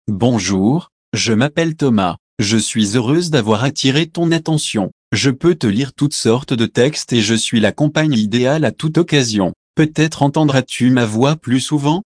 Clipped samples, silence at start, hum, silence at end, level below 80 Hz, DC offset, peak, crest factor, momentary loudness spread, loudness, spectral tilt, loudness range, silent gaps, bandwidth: under 0.1%; 0.05 s; none; 0.1 s; -52 dBFS; under 0.1%; 0 dBFS; 14 dB; 3 LU; -15 LUFS; -5 dB/octave; 1 LU; 0.92-1.12 s, 2.19-2.37 s, 4.92-5.11 s, 9.56-9.74 s; 10.5 kHz